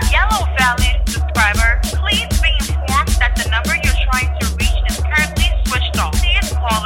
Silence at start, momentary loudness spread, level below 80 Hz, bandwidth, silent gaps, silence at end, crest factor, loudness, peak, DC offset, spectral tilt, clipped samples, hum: 0 s; 4 LU; -18 dBFS; 17 kHz; none; 0 s; 14 dB; -16 LUFS; 0 dBFS; under 0.1%; -3.5 dB/octave; under 0.1%; none